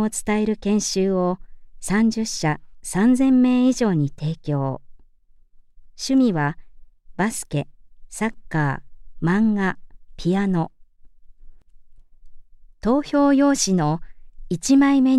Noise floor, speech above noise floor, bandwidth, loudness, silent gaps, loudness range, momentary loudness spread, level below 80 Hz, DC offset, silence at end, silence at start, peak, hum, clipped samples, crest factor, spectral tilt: -52 dBFS; 33 dB; 13.5 kHz; -21 LUFS; none; 5 LU; 14 LU; -44 dBFS; under 0.1%; 0 s; 0 s; -6 dBFS; none; under 0.1%; 14 dB; -5.5 dB/octave